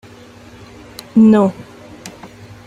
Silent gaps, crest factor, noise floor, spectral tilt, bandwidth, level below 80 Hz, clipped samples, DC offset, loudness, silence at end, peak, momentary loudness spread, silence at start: none; 16 dB; -39 dBFS; -7.5 dB/octave; 12 kHz; -52 dBFS; under 0.1%; under 0.1%; -12 LUFS; 0.4 s; -2 dBFS; 25 LU; 1.15 s